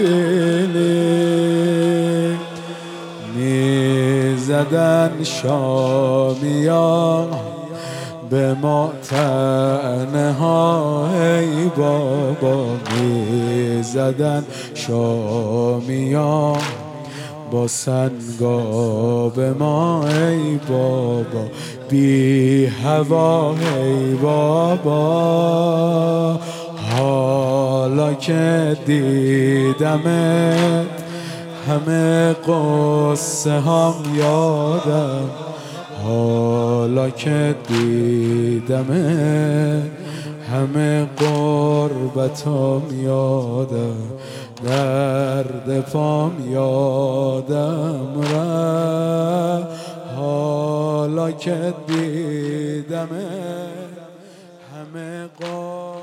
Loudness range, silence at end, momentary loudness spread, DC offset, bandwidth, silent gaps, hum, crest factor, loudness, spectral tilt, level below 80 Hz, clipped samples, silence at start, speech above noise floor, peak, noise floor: 4 LU; 0 s; 12 LU; under 0.1%; 15.5 kHz; none; none; 16 dB; -18 LUFS; -6.5 dB/octave; -68 dBFS; under 0.1%; 0 s; 25 dB; -2 dBFS; -42 dBFS